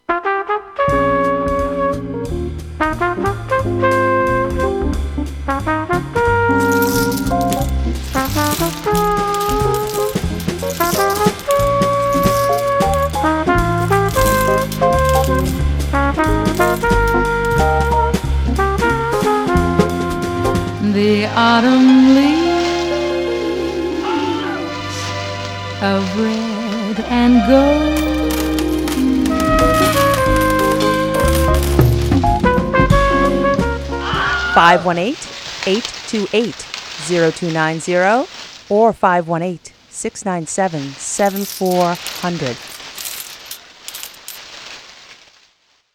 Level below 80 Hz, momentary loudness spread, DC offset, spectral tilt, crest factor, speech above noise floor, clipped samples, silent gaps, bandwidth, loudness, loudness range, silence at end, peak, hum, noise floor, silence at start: -26 dBFS; 11 LU; under 0.1%; -5.5 dB/octave; 16 dB; 40 dB; under 0.1%; none; 18.5 kHz; -16 LUFS; 6 LU; 0.8 s; 0 dBFS; none; -57 dBFS; 0.1 s